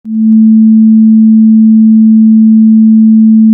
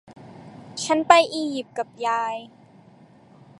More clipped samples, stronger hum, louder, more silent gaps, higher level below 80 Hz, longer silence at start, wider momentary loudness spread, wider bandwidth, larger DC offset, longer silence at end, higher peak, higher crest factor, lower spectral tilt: first, 0.4% vs under 0.1%; neither; first, -4 LUFS vs -22 LUFS; neither; about the same, -68 dBFS vs -66 dBFS; about the same, 0.05 s vs 0.1 s; second, 0 LU vs 21 LU; second, 0.4 kHz vs 11.5 kHz; neither; second, 0 s vs 1.15 s; about the same, 0 dBFS vs 0 dBFS; second, 4 dB vs 24 dB; first, -14.5 dB/octave vs -3 dB/octave